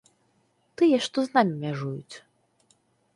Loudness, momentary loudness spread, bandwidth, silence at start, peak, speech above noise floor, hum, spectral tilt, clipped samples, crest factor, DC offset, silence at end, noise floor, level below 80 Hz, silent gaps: -25 LUFS; 20 LU; 11.5 kHz; 0.8 s; -8 dBFS; 44 dB; none; -6 dB/octave; under 0.1%; 20 dB; under 0.1%; 0.95 s; -68 dBFS; -74 dBFS; none